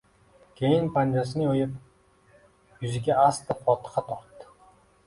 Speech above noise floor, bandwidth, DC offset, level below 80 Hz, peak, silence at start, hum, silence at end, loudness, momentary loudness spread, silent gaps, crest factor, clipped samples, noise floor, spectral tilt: 35 dB; 11.5 kHz; under 0.1%; -60 dBFS; -8 dBFS; 0.6 s; none; 0.65 s; -26 LUFS; 14 LU; none; 20 dB; under 0.1%; -60 dBFS; -7 dB/octave